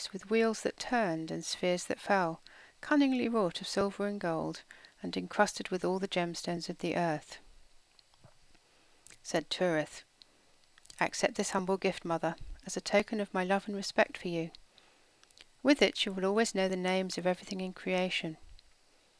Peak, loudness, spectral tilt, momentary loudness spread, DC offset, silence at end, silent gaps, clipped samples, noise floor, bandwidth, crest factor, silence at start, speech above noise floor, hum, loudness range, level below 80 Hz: -12 dBFS; -33 LUFS; -4.5 dB/octave; 10 LU; under 0.1%; 0.65 s; none; under 0.1%; -65 dBFS; 11 kHz; 22 dB; 0 s; 33 dB; none; 6 LU; -62 dBFS